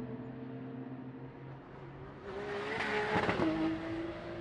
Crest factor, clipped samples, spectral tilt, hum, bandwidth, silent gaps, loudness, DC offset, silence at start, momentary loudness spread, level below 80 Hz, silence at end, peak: 20 dB; under 0.1%; -6.5 dB/octave; none; 10.5 kHz; none; -37 LUFS; under 0.1%; 0 s; 17 LU; -60 dBFS; 0 s; -18 dBFS